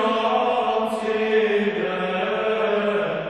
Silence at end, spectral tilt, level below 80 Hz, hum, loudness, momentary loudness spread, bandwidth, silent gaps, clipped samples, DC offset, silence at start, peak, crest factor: 0 s; -5.5 dB/octave; -64 dBFS; none; -22 LUFS; 4 LU; 11.5 kHz; none; under 0.1%; under 0.1%; 0 s; -10 dBFS; 12 dB